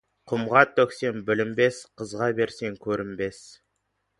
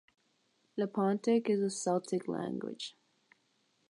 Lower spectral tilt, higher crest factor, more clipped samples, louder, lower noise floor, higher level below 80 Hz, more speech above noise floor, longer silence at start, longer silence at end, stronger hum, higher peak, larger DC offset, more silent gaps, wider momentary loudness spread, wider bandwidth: about the same, -5.5 dB/octave vs -5.5 dB/octave; first, 24 dB vs 16 dB; neither; first, -25 LUFS vs -34 LUFS; about the same, -76 dBFS vs -75 dBFS; first, -62 dBFS vs -84 dBFS; first, 51 dB vs 42 dB; second, 0.25 s vs 0.75 s; second, 0.7 s vs 1 s; neither; first, -2 dBFS vs -18 dBFS; neither; neither; about the same, 13 LU vs 13 LU; about the same, 11.5 kHz vs 11.5 kHz